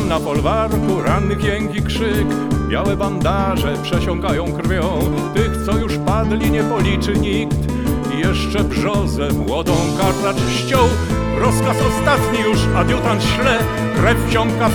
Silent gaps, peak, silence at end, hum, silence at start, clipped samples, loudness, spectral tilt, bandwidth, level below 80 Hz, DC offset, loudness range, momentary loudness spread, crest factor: none; 0 dBFS; 0 s; none; 0 s; under 0.1%; -17 LUFS; -6 dB/octave; 19 kHz; -26 dBFS; under 0.1%; 2 LU; 4 LU; 16 dB